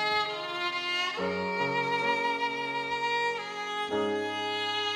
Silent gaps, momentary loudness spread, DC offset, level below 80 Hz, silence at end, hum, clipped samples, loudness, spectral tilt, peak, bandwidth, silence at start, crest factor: none; 4 LU; under 0.1%; -72 dBFS; 0 s; none; under 0.1%; -29 LUFS; -3.5 dB/octave; -16 dBFS; 15.5 kHz; 0 s; 14 dB